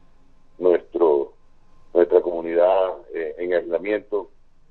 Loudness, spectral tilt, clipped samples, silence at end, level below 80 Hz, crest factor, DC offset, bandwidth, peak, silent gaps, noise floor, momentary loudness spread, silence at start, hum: -21 LUFS; -8 dB/octave; under 0.1%; 0.45 s; -56 dBFS; 20 dB; under 0.1%; 4.3 kHz; -2 dBFS; none; -49 dBFS; 11 LU; 0.6 s; none